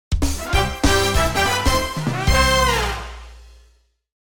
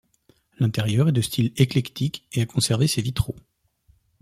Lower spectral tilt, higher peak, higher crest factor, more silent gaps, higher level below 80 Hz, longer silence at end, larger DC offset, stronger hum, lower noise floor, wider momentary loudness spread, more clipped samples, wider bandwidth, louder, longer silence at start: second, -3.5 dB/octave vs -5.5 dB/octave; about the same, -2 dBFS vs -4 dBFS; about the same, 18 dB vs 20 dB; neither; first, -26 dBFS vs -46 dBFS; second, 0.1 s vs 0.85 s; first, 2% vs under 0.1%; neither; second, -57 dBFS vs -62 dBFS; about the same, 9 LU vs 8 LU; neither; first, over 20 kHz vs 15.5 kHz; first, -19 LUFS vs -23 LUFS; second, 0.1 s vs 0.6 s